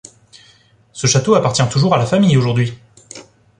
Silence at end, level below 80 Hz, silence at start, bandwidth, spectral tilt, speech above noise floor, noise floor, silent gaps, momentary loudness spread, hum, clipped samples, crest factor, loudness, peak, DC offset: 0.35 s; -48 dBFS; 0.95 s; 10.5 kHz; -5 dB/octave; 37 dB; -51 dBFS; none; 23 LU; none; under 0.1%; 16 dB; -15 LUFS; -2 dBFS; under 0.1%